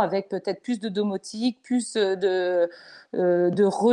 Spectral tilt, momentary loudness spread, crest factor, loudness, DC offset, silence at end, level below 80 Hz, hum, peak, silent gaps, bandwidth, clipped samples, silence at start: -5.5 dB/octave; 8 LU; 16 dB; -25 LUFS; under 0.1%; 0 s; -74 dBFS; none; -8 dBFS; none; 10.5 kHz; under 0.1%; 0 s